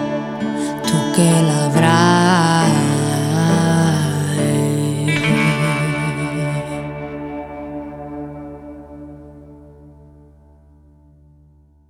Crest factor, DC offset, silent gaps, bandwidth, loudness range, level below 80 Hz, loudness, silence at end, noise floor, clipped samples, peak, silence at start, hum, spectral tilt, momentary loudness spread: 18 dB; under 0.1%; none; 15 kHz; 19 LU; -46 dBFS; -16 LUFS; 2 s; -50 dBFS; under 0.1%; 0 dBFS; 0 s; none; -5.5 dB/octave; 17 LU